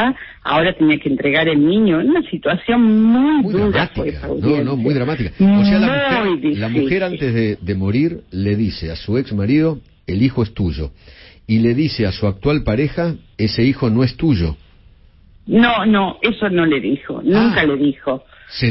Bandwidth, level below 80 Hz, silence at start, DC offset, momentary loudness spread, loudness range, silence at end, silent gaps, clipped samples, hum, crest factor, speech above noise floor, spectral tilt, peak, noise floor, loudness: 5.8 kHz; -36 dBFS; 0 s; under 0.1%; 9 LU; 4 LU; 0 s; none; under 0.1%; none; 14 dB; 31 dB; -11 dB/octave; -2 dBFS; -47 dBFS; -16 LUFS